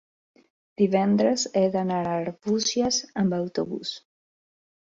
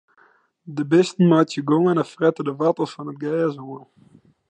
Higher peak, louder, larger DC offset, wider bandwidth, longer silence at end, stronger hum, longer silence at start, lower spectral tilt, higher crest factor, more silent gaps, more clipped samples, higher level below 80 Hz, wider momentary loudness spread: second, -8 dBFS vs -4 dBFS; second, -25 LUFS vs -20 LUFS; neither; second, 7.8 kHz vs 9.2 kHz; first, 0.85 s vs 0.7 s; neither; first, 0.8 s vs 0.65 s; second, -4.5 dB/octave vs -7 dB/octave; about the same, 18 dB vs 16 dB; neither; neither; first, -62 dBFS vs -74 dBFS; second, 9 LU vs 16 LU